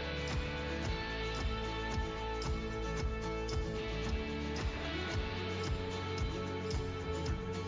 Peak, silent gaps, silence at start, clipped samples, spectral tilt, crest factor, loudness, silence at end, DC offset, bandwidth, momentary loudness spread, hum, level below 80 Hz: -26 dBFS; none; 0 s; under 0.1%; -5.5 dB/octave; 10 dB; -38 LUFS; 0 s; under 0.1%; 7.6 kHz; 1 LU; none; -42 dBFS